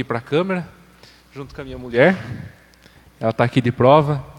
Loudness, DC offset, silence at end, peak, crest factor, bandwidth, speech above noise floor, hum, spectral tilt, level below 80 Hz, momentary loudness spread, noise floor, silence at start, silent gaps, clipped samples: -18 LUFS; under 0.1%; 0.05 s; 0 dBFS; 20 dB; 12 kHz; 31 dB; none; -7.5 dB/octave; -50 dBFS; 22 LU; -49 dBFS; 0 s; none; under 0.1%